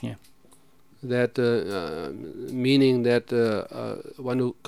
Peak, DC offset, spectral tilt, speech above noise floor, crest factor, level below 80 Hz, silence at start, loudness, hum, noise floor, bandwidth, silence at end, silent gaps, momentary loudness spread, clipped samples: -8 dBFS; 0.2%; -7 dB/octave; 34 dB; 18 dB; -64 dBFS; 0 s; -25 LUFS; none; -59 dBFS; 14.5 kHz; 0.15 s; none; 16 LU; under 0.1%